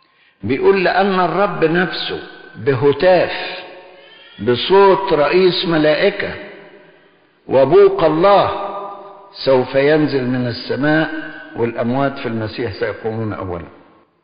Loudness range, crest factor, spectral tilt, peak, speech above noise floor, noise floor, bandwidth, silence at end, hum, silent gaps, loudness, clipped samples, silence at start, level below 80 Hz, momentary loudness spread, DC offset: 5 LU; 14 dB; -4 dB/octave; -2 dBFS; 37 dB; -52 dBFS; 5.2 kHz; 0.55 s; none; none; -15 LUFS; under 0.1%; 0.45 s; -48 dBFS; 17 LU; under 0.1%